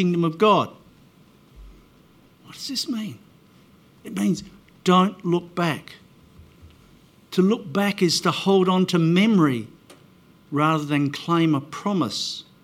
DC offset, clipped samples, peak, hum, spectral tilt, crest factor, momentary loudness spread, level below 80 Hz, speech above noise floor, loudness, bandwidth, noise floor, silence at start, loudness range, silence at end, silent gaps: under 0.1%; under 0.1%; -4 dBFS; none; -5.5 dB/octave; 18 dB; 12 LU; -60 dBFS; 33 dB; -22 LUFS; 15.5 kHz; -54 dBFS; 0 s; 10 LU; 0.2 s; none